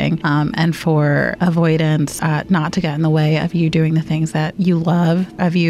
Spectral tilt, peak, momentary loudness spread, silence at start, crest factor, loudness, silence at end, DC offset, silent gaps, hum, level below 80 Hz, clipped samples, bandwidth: -7 dB/octave; -6 dBFS; 3 LU; 0 s; 10 dB; -17 LUFS; 0 s; under 0.1%; none; none; -46 dBFS; under 0.1%; 13.5 kHz